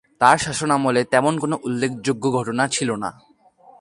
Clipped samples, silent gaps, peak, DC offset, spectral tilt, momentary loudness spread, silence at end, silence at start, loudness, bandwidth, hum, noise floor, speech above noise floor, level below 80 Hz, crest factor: under 0.1%; none; 0 dBFS; under 0.1%; -4.5 dB/octave; 8 LU; 0.7 s; 0.2 s; -20 LUFS; 11.5 kHz; none; -51 dBFS; 31 dB; -56 dBFS; 20 dB